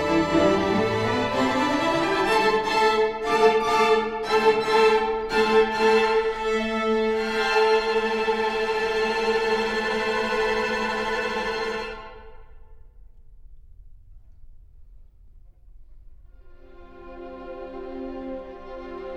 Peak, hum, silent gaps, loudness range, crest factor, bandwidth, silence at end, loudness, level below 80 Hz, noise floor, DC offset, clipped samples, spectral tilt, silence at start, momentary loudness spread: -6 dBFS; none; none; 18 LU; 18 dB; 13 kHz; 0 s; -22 LUFS; -46 dBFS; -48 dBFS; under 0.1%; under 0.1%; -4.5 dB/octave; 0 s; 17 LU